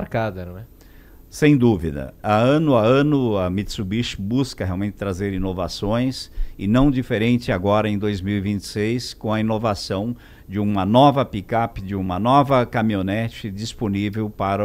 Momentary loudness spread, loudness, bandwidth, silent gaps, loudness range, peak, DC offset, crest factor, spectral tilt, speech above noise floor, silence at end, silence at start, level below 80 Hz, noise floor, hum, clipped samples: 12 LU; -21 LUFS; 15.5 kHz; none; 4 LU; -2 dBFS; under 0.1%; 18 dB; -7 dB/octave; 25 dB; 0 s; 0 s; -38 dBFS; -45 dBFS; none; under 0.1%